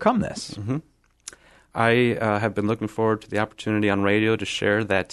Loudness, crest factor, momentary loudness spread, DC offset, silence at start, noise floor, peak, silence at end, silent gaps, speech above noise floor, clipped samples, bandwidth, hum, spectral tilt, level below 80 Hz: -23 LUFS; 20 dB; 13 LU; under 0.1%; 0 s; -46 dBFS; -4 dBFS; 0 s; none; 23 dB; under 0.1%; 12.5 kHz; none; -6 dB/octave; -54 dBFS